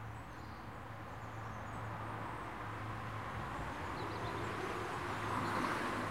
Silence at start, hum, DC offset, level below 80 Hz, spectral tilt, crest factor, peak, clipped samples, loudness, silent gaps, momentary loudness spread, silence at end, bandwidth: 0 s; none; 0.1%; -58 dBFS; -5.5 dB/octave; 18 dB; -24 dBFS; under 0.1%; -42 LUFS; none; 11 LU; 0 s; 16.5 kHz